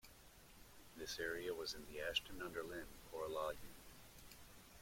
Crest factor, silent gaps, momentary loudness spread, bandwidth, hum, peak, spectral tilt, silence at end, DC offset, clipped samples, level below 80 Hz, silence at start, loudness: 24 dB; none; 20 LU; 16.5 kHz; none; -24 dBFS; -2.5 dB/octave; 0 s; under 0.1%; under 0.1%; -66 dBFS; 0.05 s; -46 LUFS